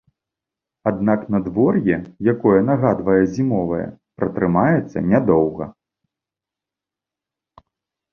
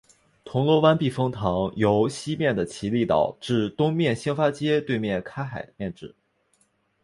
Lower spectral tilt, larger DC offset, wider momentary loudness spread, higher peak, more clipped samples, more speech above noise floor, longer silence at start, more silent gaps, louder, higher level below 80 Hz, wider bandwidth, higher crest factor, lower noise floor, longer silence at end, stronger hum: first, -10 dB/octave vs -6.5 dB/octave; neither; second, 9 LU vs 13 LU; about the same, -2 dBFS vs -4 dBFS; neither; first, 70 dB vs 44 dB; first, 0.85 s vs 0.45 s; neither; first, -19 LUFS vs -24 LUFS; first, -48 dBFS vs -54 dBFS; second, 6.8 kHz vs 11.5 kHz; about the same, 18 dB vs 20 dB; first, -87 dBFS vs -67 dBFS; first, 2.4 s vs 0.95 s; neither